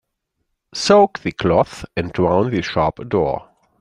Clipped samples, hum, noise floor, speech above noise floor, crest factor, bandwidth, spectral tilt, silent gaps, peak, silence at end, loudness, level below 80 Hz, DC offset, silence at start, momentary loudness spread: under 0.1%; none; -74 dBFS; 57 dB; 18 dB; 11 kHz; -5.5 dB/octave; none; -2 dBFS; 0.4 s; -18 LUFS; -46 dBFS; under 0.1%; 0.75 s; 11 LU